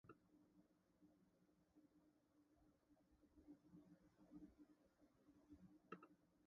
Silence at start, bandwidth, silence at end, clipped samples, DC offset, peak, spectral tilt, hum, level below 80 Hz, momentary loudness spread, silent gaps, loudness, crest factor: 0.05 s; 5.4 kHz; 0 s; under 0.1%; under 0.1%; -42 dBFS; -6.5 dB/octave; none; -86 dBFS; 6 LU; none; -67 LUFS; 28 dB